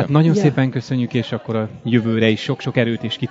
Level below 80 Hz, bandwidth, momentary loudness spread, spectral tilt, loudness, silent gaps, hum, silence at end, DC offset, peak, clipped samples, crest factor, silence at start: -58 dBFS; 7.8 kHz; 8 LU; -7 dB/octave; -19 LUFS; none; none; 0 s; under 0.1%; 0 dBFS; under 0.1%; 18 dB; 0 s